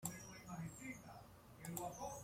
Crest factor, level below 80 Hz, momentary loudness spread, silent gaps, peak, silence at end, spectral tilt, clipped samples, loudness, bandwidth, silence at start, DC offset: 24 dB; -70 dBFS; 11 LU; none; -26 dBFS; 0 s; -4.5 dB/octave; under 0.1%; -51 LUFS; 16.5 kHz; 0 s; under 0.1%